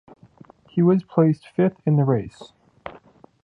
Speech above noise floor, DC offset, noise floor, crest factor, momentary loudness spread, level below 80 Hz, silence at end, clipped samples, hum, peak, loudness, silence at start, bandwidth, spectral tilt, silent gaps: 31 dB; under 0.1%; -50 dBFS; 20 dB; 22 LU; -58 dBFS; 0.55 s; under 0.1%; none; -4 dBFS; -21 LUFS; 0.75 s; 8 kHz; -10.5 dB/octave; none